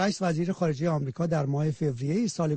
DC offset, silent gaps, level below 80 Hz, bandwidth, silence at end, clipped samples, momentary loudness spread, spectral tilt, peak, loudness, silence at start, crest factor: under 0.1%; none; -60 dBFS; 8.8 kHz; 0 s; under 0.1%; 2 LU; -6.5 dB/octave; -14 dBFS; -28 LUFS; 0 s; 12 dB